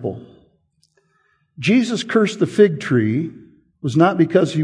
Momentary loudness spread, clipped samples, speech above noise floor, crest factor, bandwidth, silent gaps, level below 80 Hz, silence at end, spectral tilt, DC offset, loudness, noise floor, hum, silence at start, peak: 14 LU; under 0.1%; 46 dB; 18 dB; 10.5 kHz; none; -62 dBFS; 0 s; -6.5 dB/octave; under 0.1%; -18 LUFS; -63 dBFS; none; 0 s; 0 dBFS